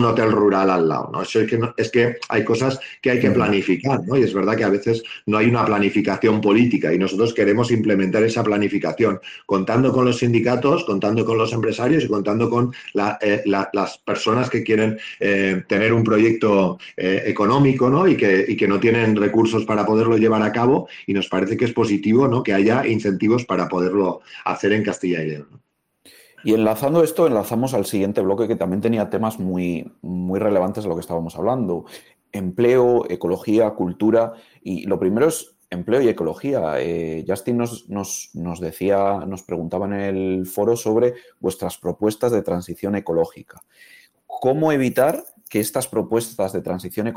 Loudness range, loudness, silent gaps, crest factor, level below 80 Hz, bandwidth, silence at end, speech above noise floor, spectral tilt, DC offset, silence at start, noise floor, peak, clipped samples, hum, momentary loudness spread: 6 LU; -20 LUFS; none; 14 dB; -58 dBFS; 16.5 kHz; 0 s; 35 dB; -6.5 dB/octave; under 0.1%; 0 s; -54 dBFS; -6 dBFS; under 0.1%; none; 10 LU